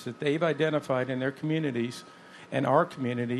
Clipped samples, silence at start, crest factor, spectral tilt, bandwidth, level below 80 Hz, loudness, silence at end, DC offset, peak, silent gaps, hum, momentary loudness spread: under 0.1%; 0 s; 20 dB; -6.5 dB/octave; 13 kHz; -76 dBFS; -29 LUFS; 0 s; under 0.1%; -10 dBFS; none; none; 11 LU